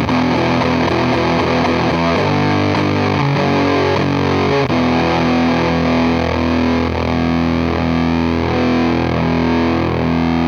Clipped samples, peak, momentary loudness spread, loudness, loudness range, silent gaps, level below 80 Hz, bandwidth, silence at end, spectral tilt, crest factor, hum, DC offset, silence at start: under 0.1%; -4 dBFS; 2 LU; -15 LUFS; 1 LU; none; -32 dBFS; 7 kHz; 0 s; -7 dB/octave; 12 dB; none; under 0.1%; 0 s